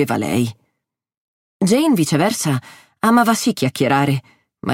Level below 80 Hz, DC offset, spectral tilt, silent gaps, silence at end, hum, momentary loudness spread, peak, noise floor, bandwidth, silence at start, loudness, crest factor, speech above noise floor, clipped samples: -60 dBFS; under 0.1%; -5 dB/octave; 1.17-1.60 s; 0 s; none; 9 LU; -2 dBFS; -75 dBFS; 17 kHz; 0 s; -17 LUFS; 16 dB; 59 dB; under 0.1%